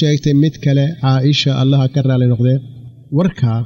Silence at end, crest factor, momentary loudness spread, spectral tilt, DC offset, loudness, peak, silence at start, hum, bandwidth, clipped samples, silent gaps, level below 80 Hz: 0 s; 10 dB; 4 LU; -7.5 dB/octave; under 0.1%; -14 LUFS; -4 dBFS; 0 s; none; 7.4 kHz; under 0.1%; none; -46 dBFS